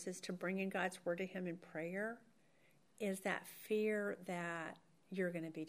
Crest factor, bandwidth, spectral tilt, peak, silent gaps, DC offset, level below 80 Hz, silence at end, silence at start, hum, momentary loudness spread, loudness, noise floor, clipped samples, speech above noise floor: 20 dB; 15.5 kHz; -5.5 dB/octave; -24 dBFS; none; under 0.1%; under -90 dBFS; 0 s; 0 s; none; 8 LU; -43 LUFS; -74 dBFS; under 0.1%; 31 dB